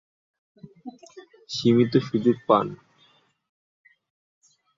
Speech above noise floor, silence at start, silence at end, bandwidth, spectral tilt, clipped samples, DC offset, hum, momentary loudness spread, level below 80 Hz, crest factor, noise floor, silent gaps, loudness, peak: 41 dB; 0.65 s; 2 s; 7.6 kHz; -7 dB/octave; under 0.1%; under 0.1%; none; 23 LU; -66 dBFS; 22 dB; -62 dBFS; none; -22 LUFS; -6 dBFS